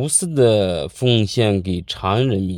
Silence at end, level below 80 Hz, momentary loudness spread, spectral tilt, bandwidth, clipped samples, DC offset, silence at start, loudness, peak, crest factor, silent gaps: 0 s; -48 dBFS; 7 LU; -5 dB/octave; 16 kHz; under 0.1%; under 0.1%; 0 s; -18 LUFS; -2 dBFS; 16 dB; none